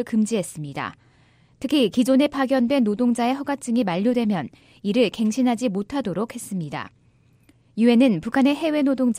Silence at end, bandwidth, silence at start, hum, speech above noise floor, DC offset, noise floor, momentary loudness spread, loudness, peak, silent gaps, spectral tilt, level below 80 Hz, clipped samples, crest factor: 0 s; 15 kHz; 0 s; none; 37 dB; under 0.1%; -58 dBFS; 13 LU; -22 LUFS; -6 dBFS; none; -5.5 dB/octave; -60 dBFS; under 0.1%; 16 dB